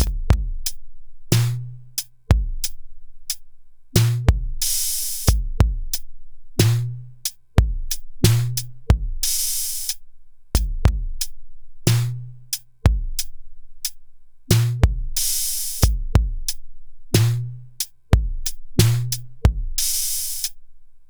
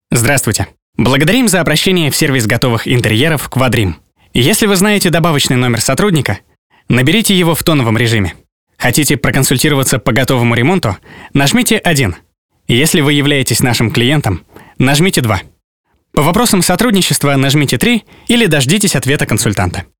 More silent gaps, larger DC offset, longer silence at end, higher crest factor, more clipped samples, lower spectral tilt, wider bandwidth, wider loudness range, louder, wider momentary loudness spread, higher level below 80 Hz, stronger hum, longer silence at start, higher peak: second, none vs 0.82-0.93 s, 6.58-6.70 s, 8.52-8.67 s, 12.38-12.49 s, 15.64-15.84 s; second, under 0.1% vs 2%; about the same, 0.05 s vs 0 s; first, 22 dB vs 12 dB; neither; about the same, -4 dB/octave vs -4.5 dB/octave; about the same, over 20 kHz vs over 20 kHz; about the same, 3 LU vs 1 LU; second, -22 LUFS vs -11 LUFS; first, 10 LU vs 7 LU; first, -26 dBFS vs -36 dBFS; first, 60 Hz at -40 dBFS vs none; about the same, 0 s vs 0 s; about the same, 0 dBFS vs 0 dBFS